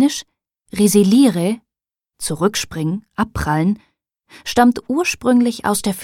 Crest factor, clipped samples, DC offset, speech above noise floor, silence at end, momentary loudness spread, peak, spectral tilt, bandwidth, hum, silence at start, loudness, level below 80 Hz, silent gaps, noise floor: 16 dB; under 0.1%; under 0.1%; 71 dB; 0 s; 14 LU; -2 dBFS; -5 dB/octave; 16.5 kHz; none; 0 s; -17 LUFS; -42 dBFS; none; -87 dBFS